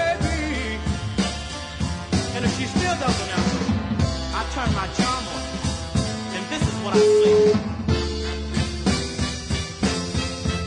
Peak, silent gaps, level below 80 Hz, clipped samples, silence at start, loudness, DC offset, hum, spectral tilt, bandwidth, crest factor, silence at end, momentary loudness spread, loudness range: -6 dBFS; none; -34 dBFS; under 0.1%; 0 s; -23 LUFS; under 0.1%; none; -5 dB/octave; 11 kHz; 16 dB; 0 s; 9 LU; 4 LU